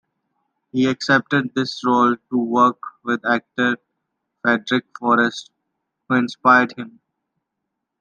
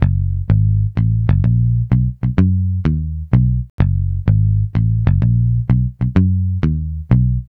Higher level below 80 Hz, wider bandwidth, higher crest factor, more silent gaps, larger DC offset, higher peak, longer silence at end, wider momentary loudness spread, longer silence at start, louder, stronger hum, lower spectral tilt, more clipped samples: second, -70 dBFS vs -24 dBFS; first, 8.6 kHz vs 4 kHz; first, 20 dB vs 14 dB; second, none vs 3.70-3.78 s; neither; about the same, -2 dBFS vs 0 dBFS; first, 1.1 s vs 0.1 s; first, 10 LU vs 4 LU; first, 0.75 s vs 0 s; second, -19 LUFS vs -16 LUFS; neither; second, -5.5 dB/octave vs -11.5 dB/octave; neither